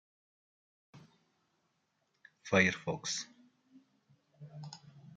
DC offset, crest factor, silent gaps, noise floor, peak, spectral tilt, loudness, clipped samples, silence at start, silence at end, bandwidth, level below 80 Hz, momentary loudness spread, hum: under 0.1%; 28 dB; none; -80 dBFS; -12 dBFS; -4 dB/octave; -32 LUFS; under 0.1%; 0.95 s; 0 s; 9.4 kHz; -80 dBFS; 24 LU; none